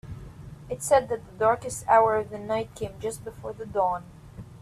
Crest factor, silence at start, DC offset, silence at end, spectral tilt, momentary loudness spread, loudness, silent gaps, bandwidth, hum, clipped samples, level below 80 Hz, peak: 20 dB; 0.05 s; under 0.1%; 0.05 s; -4.5 dB/octave; 23 LU; -26 LUFS; none; 14 kHz; none; under 0.1%; -52 dBFS; -6 dBFS